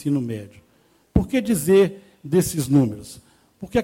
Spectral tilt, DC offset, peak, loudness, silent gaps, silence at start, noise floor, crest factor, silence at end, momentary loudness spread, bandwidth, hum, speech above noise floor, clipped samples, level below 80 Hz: -6.5 dB/octave; under 0.1%; -4 dBFS; -21 LUFS; none; 0 s; -59 dBFS; 18 dB; 0 s; 20 LU; 17 kHz; none; 39 dB; under 0.1%; -40 dBFS